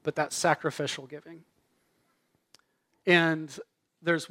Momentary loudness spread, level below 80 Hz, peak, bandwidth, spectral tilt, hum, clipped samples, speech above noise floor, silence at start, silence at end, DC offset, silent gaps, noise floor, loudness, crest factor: 21 LU; -78 dBFS; -6 dBFS; 16 kHz; -4 dB/octave; none; under 0.1%; 45 dB; 0.05 s; 0 s; under 0.1%; none; -73 dBFS; -28 LUFS; 24 dB